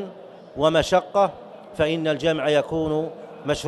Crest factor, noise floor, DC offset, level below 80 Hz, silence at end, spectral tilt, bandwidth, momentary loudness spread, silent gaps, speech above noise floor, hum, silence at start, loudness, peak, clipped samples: 18 dB; -42 dBFS; under 0.1%; -48 dBFS; 0 s; -5 dB/octave; 12 kHz; 18 LU; none; 20 dB; none; 0 s; -22 LUFS; -4 dBFS; under 0.1%